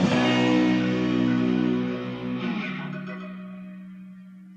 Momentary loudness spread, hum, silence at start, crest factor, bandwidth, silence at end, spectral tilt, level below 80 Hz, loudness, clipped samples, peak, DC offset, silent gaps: 21 LU; none; 0 s; 16 dB; 8.4 kHz; 0 s; -6.5 dB/octave; -58 dBFS; -24 LUFS; under 0.1%; -10 dBFS; under 0.1%; none